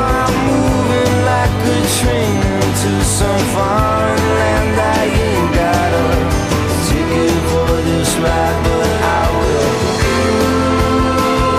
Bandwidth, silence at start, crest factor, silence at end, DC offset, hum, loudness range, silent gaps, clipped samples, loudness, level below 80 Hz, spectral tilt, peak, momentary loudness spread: 15.5 kHz; 0 s; 10 dB; 0 s; under 0.1%; none; 1 LU; none; under 0.1%; -14 LUFS; -24 dBFS; -5 dB/octave; -4 dBFS; 1 LU